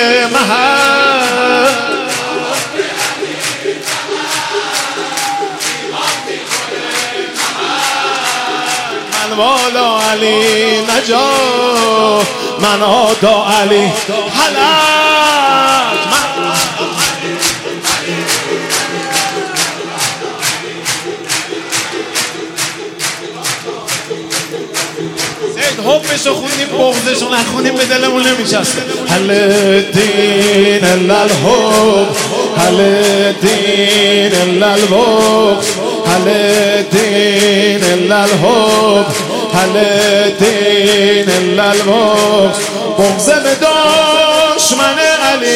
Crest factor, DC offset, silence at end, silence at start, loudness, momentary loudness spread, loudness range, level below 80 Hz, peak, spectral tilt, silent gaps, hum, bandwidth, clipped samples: 12 dB; under 0.1%; 0 s; 0 s; -11 LUFS; 8 LU; 6 LU; -50 dBFS; 0 dBFS; -3 dB/octave; none; none; 16.5 kHz; under 0.1%